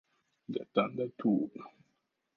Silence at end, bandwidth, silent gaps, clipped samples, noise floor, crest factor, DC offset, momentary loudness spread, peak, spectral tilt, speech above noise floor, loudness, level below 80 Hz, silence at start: 0.65 s; 5 kHz; none; under 0.1%; -80 dBFS; 22 dB; under 0.1%; 21 LU; -14 dBFS; -9 dB/octave; 47 dB; -34 LUFS; -82 dBFS; 0.5 s